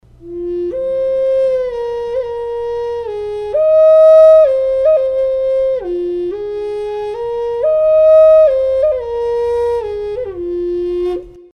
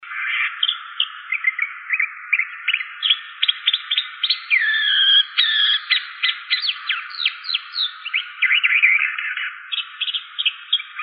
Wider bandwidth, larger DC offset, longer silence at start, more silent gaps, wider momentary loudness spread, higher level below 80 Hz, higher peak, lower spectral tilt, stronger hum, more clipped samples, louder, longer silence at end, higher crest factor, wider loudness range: first, 6 kHz vs 5.4 kHz; neither; first, 0.2 s vs 0 s; neither; first, 15 LU vs 10 LU; first, -42 dBFS vs under -90 dBFS; about the same, 0 dBFS vs -2 dBFS; first, -7 dB/octave vs 17.5 dB/octave; neither; neither; first, -13 LUFS vs -18 LUFS; first, 0.15 s vs 0 s; second, 12 dB vs 18 dB; about the same, 6 LU vs 4 LU